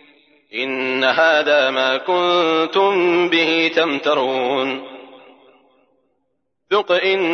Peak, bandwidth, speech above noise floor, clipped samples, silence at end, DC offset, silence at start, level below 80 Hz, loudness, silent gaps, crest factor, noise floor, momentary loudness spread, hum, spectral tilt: -4 dBFS; 6.6 kHz; 55 dB; under 0.1%; 0 s; under 0.1%; 0.55 s; -80 dBFS; -17 LUFS; none; 14 dB; -72 dBFS; 8 LU; none; -4 dB/octave